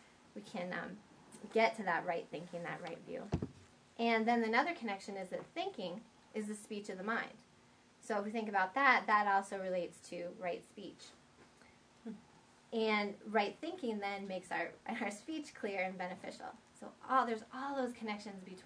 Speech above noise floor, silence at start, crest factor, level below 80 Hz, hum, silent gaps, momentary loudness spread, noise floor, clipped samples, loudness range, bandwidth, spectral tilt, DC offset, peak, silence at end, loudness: 28 dB; 0 s; 24 dB; -68 dBFS; none; none; 20 LU; -66 dBFS; under 0.1%; 7 LU; 11 kHz; -5 dB/octave; under 0.1%; -14 dBFS; 0 s; -38 LUFS